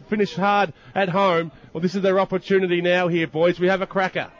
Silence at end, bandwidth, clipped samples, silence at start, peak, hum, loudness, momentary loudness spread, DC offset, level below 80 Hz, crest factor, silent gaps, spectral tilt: 0.1 s; 7.4 kHz; under 0.1%; 0 s; -10 dBFS; none; -21 LUFS; 5 LU; under 0.1%; -58 dBFS; 12 dB; none; -6.5 dB/octave